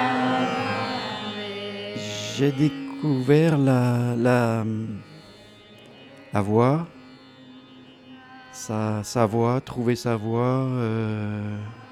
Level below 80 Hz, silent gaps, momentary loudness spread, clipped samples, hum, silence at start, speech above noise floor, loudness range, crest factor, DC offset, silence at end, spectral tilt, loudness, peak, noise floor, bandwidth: -62 dBFS; none; 12 LU; under 0.1%; none; 0 s; 25 dB; 6 LU; 18 dB; under 0.1%; 0 s; -6.5 dB/octave; -24 LUFS; -6 dBFS; -48 dBFS; 14 kHz